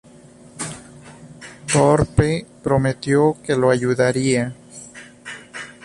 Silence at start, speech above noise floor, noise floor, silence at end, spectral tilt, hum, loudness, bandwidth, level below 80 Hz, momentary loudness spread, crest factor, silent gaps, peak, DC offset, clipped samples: 0.55 s; 28 dB; -45 dBFS; 0.15 s; -5.5 dB/octave; none; -19 LUFS; 11.5 kHz; -42 dBFS; 22 LU; 18 dB; none; -2 dBFS; under 0.1%; under 0.1%